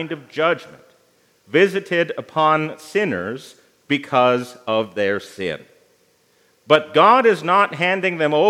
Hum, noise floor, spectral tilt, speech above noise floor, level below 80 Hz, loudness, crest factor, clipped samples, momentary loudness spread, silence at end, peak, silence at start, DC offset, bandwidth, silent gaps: none; -59 dBFS; -5.5 dB/octave; 41 dB; -72 dBFS; -18 LUFS; 20 dB; under 0.1%; 13 LU; 0 s; 0 dBFS; 0 s; under 0.1%; 15 kHz; none